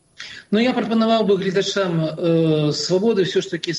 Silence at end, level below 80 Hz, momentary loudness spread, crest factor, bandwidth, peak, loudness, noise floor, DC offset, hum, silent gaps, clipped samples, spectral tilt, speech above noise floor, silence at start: 0 s; -62 dBFS; 5 LU; 14 dB; 10.5 kHz; -4 dBFS; -19 LUFS; -39 dBFS; under 0.1%; none; none; under 0.1%; -5.5 dB/octave; 20 dB; 0.2 s